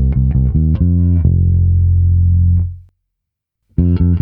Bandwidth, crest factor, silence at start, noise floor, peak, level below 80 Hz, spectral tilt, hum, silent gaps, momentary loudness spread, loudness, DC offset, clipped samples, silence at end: 1.5 kHz; 12 dB; 0 s; -77 dBFS; 0 dBFS; -20 dBFS; -14 dB/octave; none; none; 5 LU; -14 LUFS; under 0.1%; under 0.1%; 0 s